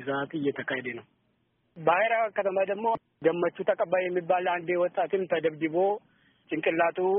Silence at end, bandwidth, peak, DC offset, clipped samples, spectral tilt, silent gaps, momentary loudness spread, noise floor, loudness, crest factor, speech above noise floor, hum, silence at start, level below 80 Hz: 0 s; 3.8 kHz; -10 dBFS; under 0.1%; under 0.1%; -0.5 dB/octave; none; 6 LU; -72 dBFS; -28 LUFS; 18 dB; 45 dB; none; 0 s; -74 dBFS